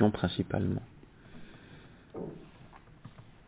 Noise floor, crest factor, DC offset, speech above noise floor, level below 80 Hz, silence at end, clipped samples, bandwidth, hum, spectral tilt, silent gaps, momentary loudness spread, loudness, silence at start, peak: -54 dBFS; 24 dB; under 0.1%; 23 dB; -54 dBFS; 0.2 s; under 0.1%; 4 kHz; none; -6.5 dB/octave; none; 22 LU; -34 LUFS; 0 s; -12 dBFS